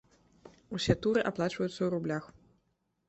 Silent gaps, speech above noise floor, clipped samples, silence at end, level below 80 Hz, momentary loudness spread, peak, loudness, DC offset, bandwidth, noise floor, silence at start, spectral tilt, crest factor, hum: none; 46 dB; under 0.1%; 0.8 s; -56 dBFS; 9 LU; -10 dBFS; -32 LUFS; under 0.1%; 8.4 kHz; -77 dBFS; 0.45 s; -6 dB/octave; 24 dB; none